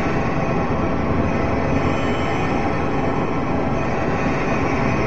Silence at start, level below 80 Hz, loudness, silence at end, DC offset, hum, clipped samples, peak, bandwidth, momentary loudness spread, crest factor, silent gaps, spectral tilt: 0 s; -32 dBFS; -21 LUFS; 0 s; 4%; none; under 0.1%; -6 dBFS; 8.4 kHz; 2 LU; 14 dB; none; -7.5 dB/octave